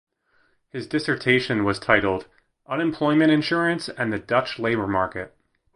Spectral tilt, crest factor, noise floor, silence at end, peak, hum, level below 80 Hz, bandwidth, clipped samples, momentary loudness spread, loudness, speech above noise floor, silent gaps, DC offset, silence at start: -6 dB/octave; 22 dB; -65 dBFS; 0.5 s; -2 dBFS; none; -52 dBFS; 11 kHz; under 0.1%; 11 LU; -22 LUFS; 42 dB; none; under 0.1%; 0.75 s